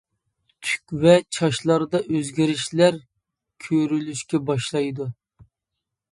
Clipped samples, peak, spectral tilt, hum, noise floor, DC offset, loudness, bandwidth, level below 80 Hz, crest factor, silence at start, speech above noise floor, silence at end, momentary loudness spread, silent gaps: under 0.1%; -2 dBFS; -5.5 dB/octave; none; -83 dBFS; under 0.1%; -22 LUFS; 11.5 kHz; -60 dBFS; 20 dB; 0.6 s; 62 dB; 1 s; 13 LU; none